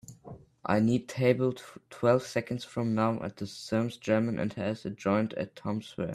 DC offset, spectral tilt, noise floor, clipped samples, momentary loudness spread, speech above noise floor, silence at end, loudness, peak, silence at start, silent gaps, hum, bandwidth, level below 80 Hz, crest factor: under 0.1%; -7 dB/octave; -50 dBFS; under 0.1%; 14 LU; 20 dB; 0 s; -30 LUFS; -10 dBFS; 0.1 s; none; none; 13.5 kHz; -64 dBFS; 20 dB